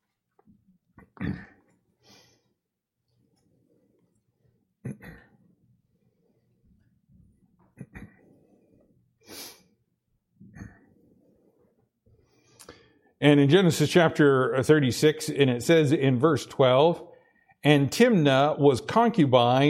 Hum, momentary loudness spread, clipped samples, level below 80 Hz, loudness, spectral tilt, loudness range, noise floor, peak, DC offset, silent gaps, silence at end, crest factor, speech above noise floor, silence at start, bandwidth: none; 22 LU; under 0.1%; -62 dBFS; -22 LUFS; -6 dB/octave; 22 LU; -83 dBFS; -4 dBFS; under 0.1%; none; 0 s; 22 dB; 62 dB; 1.2 s; 16.5 kHz